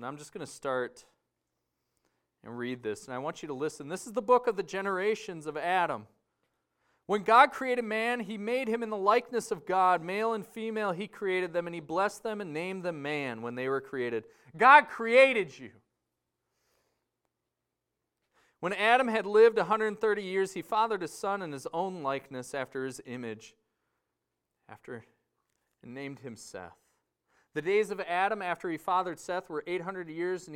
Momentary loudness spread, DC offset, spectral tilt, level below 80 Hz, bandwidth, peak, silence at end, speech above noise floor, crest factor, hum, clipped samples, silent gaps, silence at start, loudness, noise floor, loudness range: 18 LU; under 0.1%; -4.5 dB/octave; -76 dBFS; 16 kHz; -6 dBFS; 0 s; 56 dB; 26 dB; none; under 0.1%; none; 0 s; -29 LUFS; -86 dBFS; 16 LU